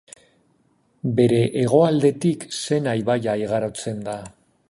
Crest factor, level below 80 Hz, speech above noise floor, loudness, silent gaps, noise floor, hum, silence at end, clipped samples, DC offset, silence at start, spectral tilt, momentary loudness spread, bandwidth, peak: 18 dB; -58 dBFS; 43 dB; -21 LUFS; none; -63 dBFS; none; 0.4 s; under 0.1%; under 0.1%; 1.05 s; -6.5 dB/octave; 12 LU; 11.5 kHz; -4 dBFS